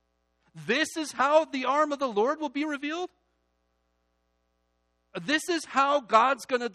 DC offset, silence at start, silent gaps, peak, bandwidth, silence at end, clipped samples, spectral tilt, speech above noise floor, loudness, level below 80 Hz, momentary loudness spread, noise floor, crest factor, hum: under 0.1%; 0.55 s; none; -6 dBFS; 13 kHz; 0.05 s; under 0.1%; -3 dB/octave; 48 dB; -26 LUFS; -76 dBFS; 12 LU; -74 dBFS; 22 dB; 60 Hz at -70 dBFS